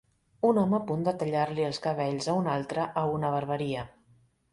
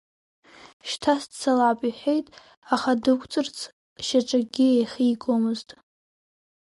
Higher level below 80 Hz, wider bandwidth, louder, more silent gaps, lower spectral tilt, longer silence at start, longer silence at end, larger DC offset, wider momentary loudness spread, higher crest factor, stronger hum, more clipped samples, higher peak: about the same, -64 dBFS vs -66 dBFS; about the same, 11.5 kHz vs 11.5 kHz; second, -29 LUFS vs -24 LUFS; second, none vs 0.73-0.80 s, 2.57-2.62 s, 3.73-3.96 s; first, -6.5 dB/octave vs -4 dB/octave; second, 0.45 s vs 0.65 s; second, 0.65 s vs 1 s; neither; second, 6 LU vs 12 LU; about the same, 18 dB vs 16 dB; neither; neither; second, -12 dBFS vs -8 dBFS